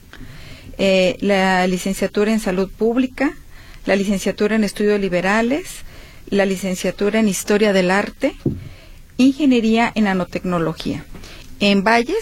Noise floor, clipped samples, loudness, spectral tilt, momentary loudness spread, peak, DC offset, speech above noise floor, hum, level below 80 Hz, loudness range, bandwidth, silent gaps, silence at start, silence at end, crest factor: -39 dBFS; under 0.1%; -18 LUFS; -5 dB/octave; 15 LU; 0 dBFS; under 0.1%; 22 dB; none; -40 dBFS; 2 LU; 16 kHz; none; 0.15 s; 0 s; 18 dB